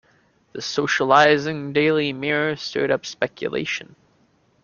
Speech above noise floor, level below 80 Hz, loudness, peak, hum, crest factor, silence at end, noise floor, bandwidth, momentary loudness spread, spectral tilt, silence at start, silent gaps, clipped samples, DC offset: 40 dB; -62 dBFS; -21 LUFS; 0 dBFS; none; 22 dB; 0.8 s; -61 dBFS; 7.2 kHz; 12 LU; -4.5 dB/octave; 0.55 s; none; under 0.1%; under 0.1%